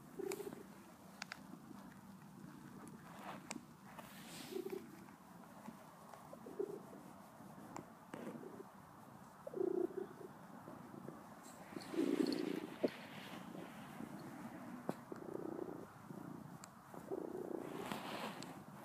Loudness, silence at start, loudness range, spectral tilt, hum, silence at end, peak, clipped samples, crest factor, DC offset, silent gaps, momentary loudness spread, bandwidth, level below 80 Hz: -49 LUFS; 0 s; 9 LU; -5 dB/octave; none; 0 s; -24 dBFS; under 0.1%; 24 dB; under 0.1%; none; 15 LU; 15.5 kHz; -82 dBFS